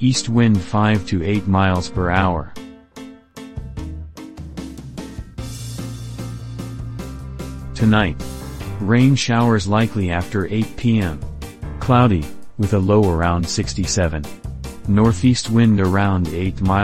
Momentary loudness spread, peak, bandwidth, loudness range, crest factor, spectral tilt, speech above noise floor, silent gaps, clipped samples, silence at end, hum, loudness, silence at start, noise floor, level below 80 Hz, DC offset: 18 LU; -2 dBFS; 15 kHz; 13 LU; 16 dB; -6 dB/octave; 22 dB; none; under 0.1%; 0 s; none; -18 LUFS; 0 s; -39 dBFS; -34 dBFS; 1%